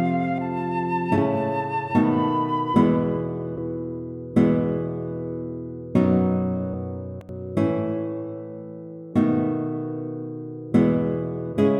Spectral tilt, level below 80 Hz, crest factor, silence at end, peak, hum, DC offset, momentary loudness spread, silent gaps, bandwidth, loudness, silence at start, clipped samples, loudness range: -9.5 dB/octave; -54 dBFS; 18 dB; 0 s; -6 dBFS; none; under 0.1%; 14 LU; none; 8.6 kHz; -24 LUFS; 0 s; under 0.1%; 4 LU